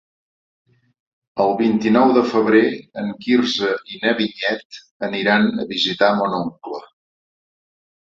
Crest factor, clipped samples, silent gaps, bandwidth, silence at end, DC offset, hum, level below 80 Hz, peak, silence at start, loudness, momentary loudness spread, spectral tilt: 18 dB; under 0.1%; 4.65-4.70 s, 4.91-5.00 s; 7.6 kHz; 1.25 s; under 0.1%; none; -62 dBFS; -2 dBFS; 1.35 s; -18 LUFS; 13 LU; -5.5 dB/octave